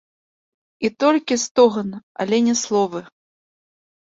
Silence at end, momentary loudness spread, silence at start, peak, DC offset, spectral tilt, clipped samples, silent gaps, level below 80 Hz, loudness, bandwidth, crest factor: 1.05 s; 12 LU; 0.8 s; -2 dBFS; under 0.1%; -4 dB/octave; under 0.1%; 1.51-1.55 s, 2.03-2.15 s; -66 dBFS; -19 LUFS; 8 kHz; 20 dB